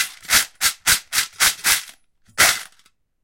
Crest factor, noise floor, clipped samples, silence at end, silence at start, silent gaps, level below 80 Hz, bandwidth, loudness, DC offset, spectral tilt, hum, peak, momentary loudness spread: 20 dB; -59 dBFS; under 0.1%; 0.6 s; 0 s; none; -50 dBFS; 17 kHz; -17 LUFS; under 0.1%; 1.5 dB/octave; none; 0 dBFS; 6 LU